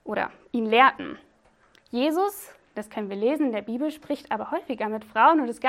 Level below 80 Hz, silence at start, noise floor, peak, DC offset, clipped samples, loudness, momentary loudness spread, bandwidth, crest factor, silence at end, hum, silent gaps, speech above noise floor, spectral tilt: -68 dBFS; 0.05 s; -61 dBFS; -4 dBFS; under 0.1%; under 0.1%; -24 LUFS; 18 LU; 16.5 kHz; 22 dB; 0 s; none; none; 37 dB; -4.5 dB/octave